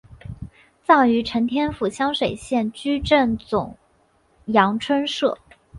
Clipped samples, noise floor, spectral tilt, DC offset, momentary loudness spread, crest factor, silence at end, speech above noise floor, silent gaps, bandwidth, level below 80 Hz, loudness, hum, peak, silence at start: under 0.1%; -61 dBFS; -5.5 dB/octave; under 0.1%; 20 LU; 20 dB; 0 s; 41 dB; none; 11.5 kHz; -46 dBFS; -21 LUFS; none; -2 dBFS; 0.1 s